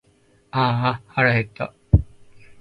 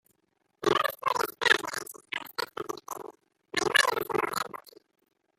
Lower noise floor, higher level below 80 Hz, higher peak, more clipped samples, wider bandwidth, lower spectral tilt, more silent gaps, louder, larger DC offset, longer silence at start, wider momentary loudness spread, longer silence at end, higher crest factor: second, -59 dBFS vs -75 dBFS; first, -32 dBFS vs -68 dBFS; first, 0 dBFS vs -6 dBFS; neither; second, 5.2 kHz vs 16 kHz; first, -8.5 dB/octave vs -1.5 dB/octave; neither; first, -21 LUFS vs -29 LUFS; neither; about the same, 0.55 s vs 0.6 s; second, 12 LU vs 15 LU; second, 0.55 s vs 0.8 s; about the same, 22 dB vs 26 dB